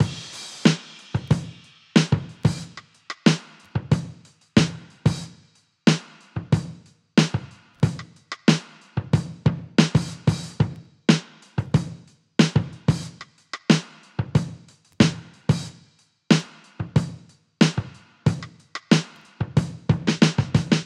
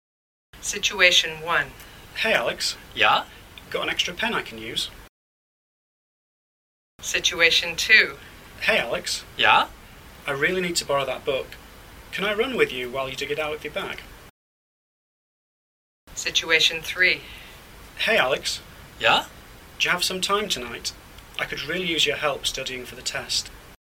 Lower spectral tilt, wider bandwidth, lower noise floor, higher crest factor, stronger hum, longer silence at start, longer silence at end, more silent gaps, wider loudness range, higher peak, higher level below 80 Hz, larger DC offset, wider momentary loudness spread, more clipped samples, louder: first, -6 dB/octave vs -1.5 dB/octave; second, 11.5 kHz vs 17.5 kHz; first, -58 dBFS vs -45 dBFS; about the same, 24 dB vs 24 dB; neither; second, 0 s vs 0.55 s; about the same, 0 s vs 0.05 s; second, none vs 5.09-6.99 s, 14.30-16.07 s; second, 2 LU vs 9 LU; about the same, 0 dBFS vs -2 dBFS; about the same, -48 dBFS vs -52 dBFS; neither; about the same, 16 LU vs 15 LU; neither; about the same, -23 LUFS vs -22 LUFS